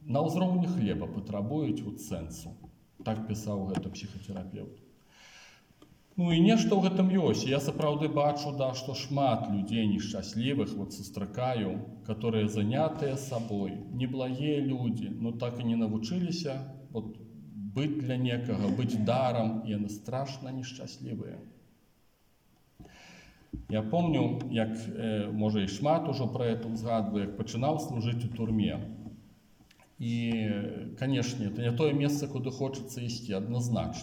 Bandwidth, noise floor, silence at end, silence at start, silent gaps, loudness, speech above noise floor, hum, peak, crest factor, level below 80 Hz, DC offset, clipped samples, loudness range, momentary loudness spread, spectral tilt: 16.5 kHz; -67 dBFS; 0 s; 0 s; none; -31 LUFS; 36 dB; none; -12 dBFS; 18 dB; -60 dBFS; under 0.1%; under 0.1%; 9 LU; 13 LU; -6.5 dB/octave